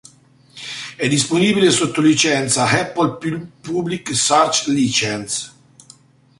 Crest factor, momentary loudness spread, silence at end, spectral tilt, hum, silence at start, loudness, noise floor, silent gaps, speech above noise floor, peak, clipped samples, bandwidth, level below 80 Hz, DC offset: 18 dB; 14 LU; 0.9 s; -3.5 dB/octave; none; 0.55 s; -17 LUFS; -50 dBFS; none; 33 dB; -2 dBFS; under 0.1%; 11.5 kHz; -56 dBFS; under 0.1%